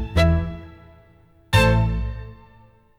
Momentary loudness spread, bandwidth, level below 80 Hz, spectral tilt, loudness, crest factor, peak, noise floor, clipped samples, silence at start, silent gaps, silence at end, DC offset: 21 LU; 16 kHz; -30 dBFS; -6 dB/octave; -21 LUFS; 16 dB; -6 dBFS; -53 dBFS; under 0.1%; 0 s; none; 0.65 s; under 0.1%